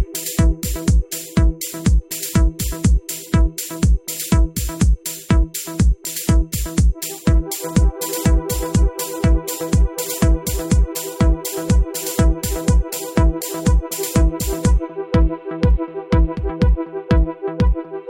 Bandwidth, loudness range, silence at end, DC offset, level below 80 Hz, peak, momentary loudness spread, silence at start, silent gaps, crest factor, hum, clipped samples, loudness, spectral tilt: 17 kHz; 0 LU; 0 s; under 0.1%; -20 dBFS; -2 dBFS; 3 LU; 0 s; none; 16 dB; none; under 0.1%; -19 LUFS; -5.5 dB/octave